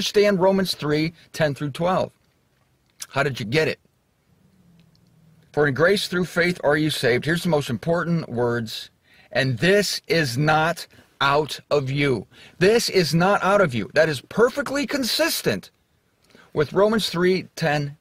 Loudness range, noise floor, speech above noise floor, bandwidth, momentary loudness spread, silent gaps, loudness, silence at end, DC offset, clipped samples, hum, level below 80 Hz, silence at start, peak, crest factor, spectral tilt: 6 LU; -64 dBFS; 43 dB; 16 kHz; 9 LU; none; -21 LUFS; 0.05 s; under 0.1%; under 0.1%; none; -54 dBFS; 0 s; -6 dBFS; 16 dB; -5 dB/octave